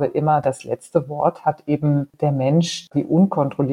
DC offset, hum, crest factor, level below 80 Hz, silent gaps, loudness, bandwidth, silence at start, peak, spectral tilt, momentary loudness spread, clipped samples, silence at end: under 0.1%; none; 16 dB; -60 dBFS; none; -20 LUFS; 11 kHz; 0 s; -2 dBFS; -7 dB/octave; 6 LU; under 0.1%; 0 s